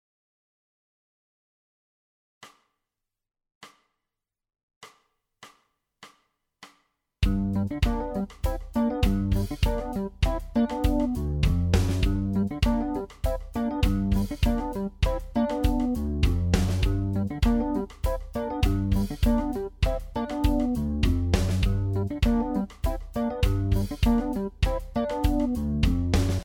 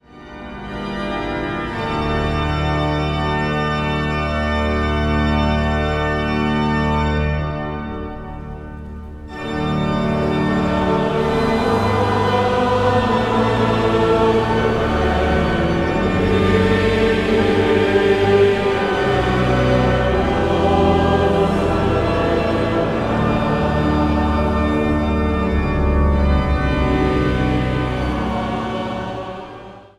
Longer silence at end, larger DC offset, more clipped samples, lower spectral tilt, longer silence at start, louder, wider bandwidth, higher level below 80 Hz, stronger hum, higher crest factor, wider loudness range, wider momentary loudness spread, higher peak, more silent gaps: about the same, 0 s vs 0.1 s; neither; neither; about the same, -7 dB/octave vs -7 dB/octave; first, 2.4 s vs 0.15 s; second, -27 LUFS vs -18 LUFS; first, 18 kHz vs 11.5 kHz; about the same, -30 dBFS vs -26 dBFS; neither; about the same, 18 dB vs 16 dB; about the same, 3 LU vs 5 LU; second, 6 LU vs 11 LU; second, -8 dBFS vs -2 dBFS; first, 3.55-3.61 s, 4.63-4.68 s, 4.76-4.81 s vs none